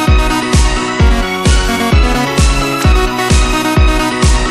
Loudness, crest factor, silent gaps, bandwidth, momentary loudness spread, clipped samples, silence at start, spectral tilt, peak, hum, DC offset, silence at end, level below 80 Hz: -12 LUFS; 10 dB; none; 15 kHz; 1 LU; under 0.1%; 0 s; -4.5 dB/octave; 0 dBFS; none; under 0.1%; 0 s; -12 dBFS